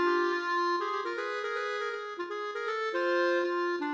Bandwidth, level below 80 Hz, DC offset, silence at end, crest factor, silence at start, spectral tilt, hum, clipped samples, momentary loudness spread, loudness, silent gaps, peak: 7.8 kHz; -86 dBFS; under 0.1%; 0 s; 14 dB; 0 s; -2 dB/octave; none; under 0.1%; 8 LU; -31 LUFS; none; -18 dBFS